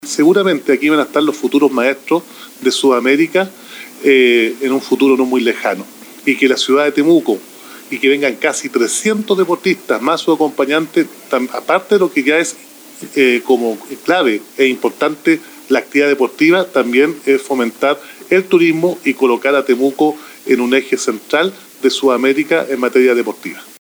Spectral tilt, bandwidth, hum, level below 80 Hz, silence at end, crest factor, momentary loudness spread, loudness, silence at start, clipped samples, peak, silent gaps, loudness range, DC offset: -4 dB/octave; over 20 kHz; none; -70 dBFS; 0.15 s; 14 dB; 8 LU; -14 LUFS; 0.05 s; under 0.1%; 0 dBFS; none; 2 LU; under 0.1%